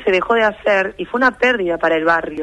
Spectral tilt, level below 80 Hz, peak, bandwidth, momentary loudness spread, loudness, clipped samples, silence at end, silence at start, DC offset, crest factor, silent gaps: -5 dB/octave; -48 dBFS; -4 dBFS; 10.5 kHz; 3 LU; -16 LUFS; under 0.1%; 0 s; 0 s; under 0.1%; 14 dB; none